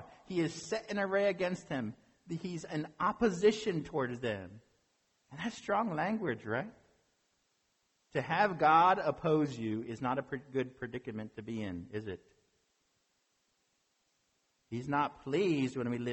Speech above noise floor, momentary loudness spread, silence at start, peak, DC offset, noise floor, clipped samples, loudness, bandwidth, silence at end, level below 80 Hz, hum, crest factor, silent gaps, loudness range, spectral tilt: 44 dB; 14 LU; 0 s; -14 dBFS; under 0.1%; -78 dBFS; under 0.1%; -34 LUFS; 8.4 kHz; 0 s; -68 dBFS; none; 20 dB; none; 13 LU; -6 dB/octave